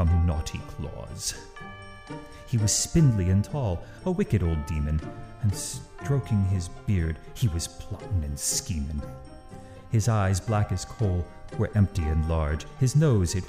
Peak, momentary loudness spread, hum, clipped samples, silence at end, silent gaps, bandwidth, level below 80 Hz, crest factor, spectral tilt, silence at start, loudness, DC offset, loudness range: -10 dBFS; 18 LU; none; under 0.1%; 0 s; none; 15.5 kHz; -36 dBFS; 16 dB; -5.5 dB/octave; 0 s; -27 LUFS; under 0.1%; 3 LU